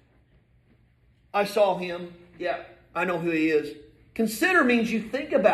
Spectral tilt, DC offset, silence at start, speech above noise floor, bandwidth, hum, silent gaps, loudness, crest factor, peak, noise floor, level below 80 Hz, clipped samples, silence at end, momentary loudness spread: -5 dB/octave; under 0.1%; 1.35 s; 37 dB; 14 kHz; none; none; -25 LUFS; 20 dB; -6 dBFS; -61 dBFS; -62 dBFS; under 0.1%; 0 s; 15 LU